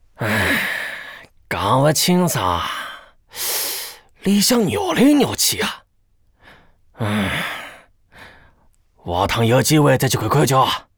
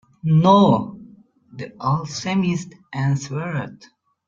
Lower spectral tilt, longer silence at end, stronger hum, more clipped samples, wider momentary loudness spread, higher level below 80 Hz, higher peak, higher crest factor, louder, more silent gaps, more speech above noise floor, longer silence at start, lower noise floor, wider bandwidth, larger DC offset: second, -4 dB/octave vs -7 dB/octave; second, 0.15 s vs 0.5 s; neither; neither; second, 16 LU vs 20 LU; first, -46 dBFS vs -56 dBFS; second, -4 dBFS vs 0 dBFS; about the same, 16 dB vs 20 dB; about the same, -18 LUFS vs -20 LUFS; neither; first, 42 dB vs 29 dB; about the same, 0.2 s vs 0.25 s; first, -59 dBFS vs -48 dBFS; first, over 20 kHz vs 7.6 kHz; neither